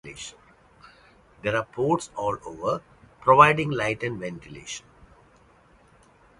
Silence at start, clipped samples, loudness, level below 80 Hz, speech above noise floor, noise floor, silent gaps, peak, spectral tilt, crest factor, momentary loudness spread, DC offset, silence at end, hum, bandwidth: 0.05 s; under 0.1%; -23 LUFS; -56 dBFS; 33 dB; -57 dBFS; none; 0 dBFS; -5 dB/octave; 26 dB; 22 LU; under 0.1%; 1.6 s; none; 11.5 kHz